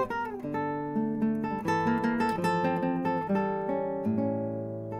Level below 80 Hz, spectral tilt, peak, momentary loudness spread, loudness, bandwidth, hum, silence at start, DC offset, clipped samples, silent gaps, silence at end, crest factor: -60 dBFS; -7.5 dB/octave; -16 dBFS; 5 LU; -30 LUFS; 13.5 kHz; none; 0 s; under 0.1%; under 0.1%; none; 0 s; 14 dB